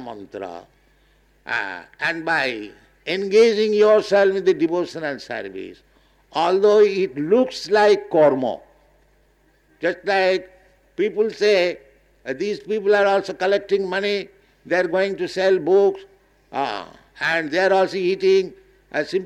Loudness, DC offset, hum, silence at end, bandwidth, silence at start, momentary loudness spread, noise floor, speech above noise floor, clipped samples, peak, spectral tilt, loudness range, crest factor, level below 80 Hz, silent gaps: -20 LUFS; under 0.1%; 50 Hz at -65 dBFS; 0 s; 10 kHz; 0 s; 18 LU; -59 dBFS; 40 dB; under 0.1%; -6 dBFS; -5 dB/octave; 4 LU; 14 dB; -62 dBFS; none